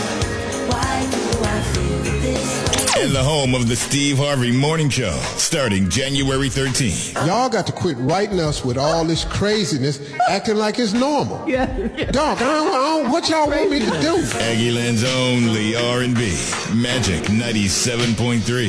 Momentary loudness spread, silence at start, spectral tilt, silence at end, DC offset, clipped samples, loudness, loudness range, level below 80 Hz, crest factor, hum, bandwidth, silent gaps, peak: 4 LU; 0 s; -4.5 dB/octave; 0 s; under 0.1%; under 0.1%; -19 LUFS; 2 LU; -34 dBFS; 16 dB; none; 11 kHz; none; -2 dBFS